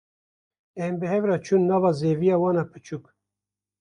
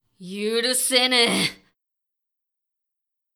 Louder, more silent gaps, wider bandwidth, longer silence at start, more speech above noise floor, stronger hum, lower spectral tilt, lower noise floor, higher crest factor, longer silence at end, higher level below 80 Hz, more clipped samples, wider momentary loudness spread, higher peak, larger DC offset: second, -23 LUFS vs -20 LUFS; neither; second, 10 kHz vs over 20 kHz; first, 0.75 s vs 0.2 s; first, 66 dB vs 62 dB; first, 50 Hz at -50 dBFS vs none; first, -8 dB/octave vs -1.5 dB/octave; first, -89 dBFS vs -83 dBFS; second, 16 dB vs 22 dB; second, 0.8 s vs 1.8 s; about the same, -66 dBFS vs -70 dBFS; neither; first, 17 LU vs 11 LU; second, -10 dBFS vs -4 dBFS; neither